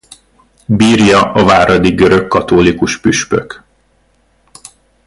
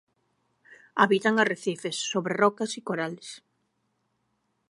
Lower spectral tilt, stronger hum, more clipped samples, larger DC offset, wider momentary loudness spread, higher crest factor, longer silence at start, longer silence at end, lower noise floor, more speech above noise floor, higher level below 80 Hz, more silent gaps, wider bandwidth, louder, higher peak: about the same, -5 dB/octave vs -4 dB/octave; neither; neither; neither; second, 9 LU vs 14 LU; second, 12 dB vs 24 dB; second, 0.7 s vs 0.95 s; first, 1.5 s vs 1.35 s; second, -54 dBFS vs -75 dBFS; second, 45 dB vs 49 dB; first, -36 dBFS vs -80 dBFS; neither; about the same, 11.5 kHz vs 11.5 kHz; first, -10 LUFS vs -26 LUFS; first, 0 dBFS vs -4 dBFS